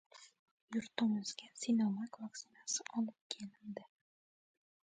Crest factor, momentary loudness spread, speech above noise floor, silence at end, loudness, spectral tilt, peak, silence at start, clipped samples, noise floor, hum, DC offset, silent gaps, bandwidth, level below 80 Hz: 22 dB; 16 LU; over 50 dB; 1.1 s; -40 LUFS; -4 dB/octave; -20 dBFS; 0.15 s; under 0.1%; under -90 dBFS; none; under 0.1%; 0.39-0.68 s, 3.21-3.30 s; 9.4 kHz; -86 dBFS